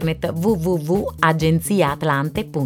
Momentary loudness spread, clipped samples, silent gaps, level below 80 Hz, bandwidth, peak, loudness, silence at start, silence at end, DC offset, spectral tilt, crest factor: 4 LU; under 0.1%; none; -40 dBFS; 17 kHz; -2 dBFS; -19 LUFS; 0 s; 0 s; under 0.1%; -6 dB/octave; 18 dB